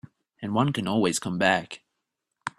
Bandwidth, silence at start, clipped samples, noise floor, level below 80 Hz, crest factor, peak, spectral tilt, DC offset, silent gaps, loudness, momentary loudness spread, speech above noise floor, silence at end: 14.5 kHz; 0.4 s; under 0.1%; -82 dBFS; -64 dBFS; 22 dB; -4 dBFS; -4.5 dB/octave; under 0.1%; none; -25 LUFS; 16 LU; 57 dB; 0.1 s